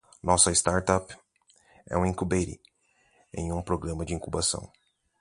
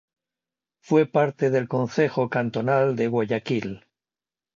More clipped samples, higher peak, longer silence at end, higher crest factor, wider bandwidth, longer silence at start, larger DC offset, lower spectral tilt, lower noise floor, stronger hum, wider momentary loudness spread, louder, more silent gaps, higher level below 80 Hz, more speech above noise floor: neither; about the same, -6 dBFS vs -6 dBFS; second, 0.55 s vs 0.8 s; first, 24 dB vs 18 dB; first, 11.5 kHz vs 7.4 kHz; second, 0.25 s vs 0.9 s; neither; second, -3.5 dB/octave vs -7.5 dB/octave; second, -67 dBFS vs under -90 dBFS; neither; first, 15 LU vs 7 LU; second, -27 LUFS vs -23 LUFS; neither; first, -44 dBFS vs -66 dBFS; second, 40 dB vs over 67 dB